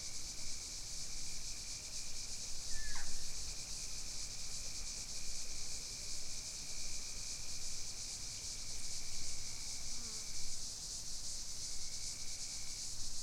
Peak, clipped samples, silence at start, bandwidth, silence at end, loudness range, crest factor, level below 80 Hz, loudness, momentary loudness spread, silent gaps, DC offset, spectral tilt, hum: -24 dBFS; under 0.1%; 0 s; 15.5 kHz; 0 s; 0 LU; 14 dB; -50 dBFS; -43 LUFS; 1 LU; none; under 0.1%; 0 dB/octave; none